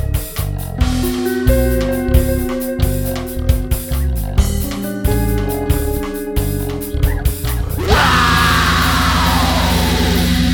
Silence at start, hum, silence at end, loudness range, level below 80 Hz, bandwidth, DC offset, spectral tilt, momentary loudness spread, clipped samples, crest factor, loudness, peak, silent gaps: 0 s; none; 0 s; 5 LU; -20 dBFS; over 20 kHz; under 0.1%; -5 dB/octave; 9 LU; under 0.1%; 16 dB; -16 LUFS; 0 dBFS; none